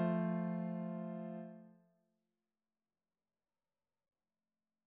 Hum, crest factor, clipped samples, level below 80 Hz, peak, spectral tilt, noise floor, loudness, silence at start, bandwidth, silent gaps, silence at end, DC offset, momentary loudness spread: none; 20 dB; under 0.1%; under -90 dBFS; -24 dBFS; -9 dB/octave; under -90 dBFS; -41 LUFS; 0 s; 3.6 kHz; none; 3.15 s; under 0.1%; 15 LU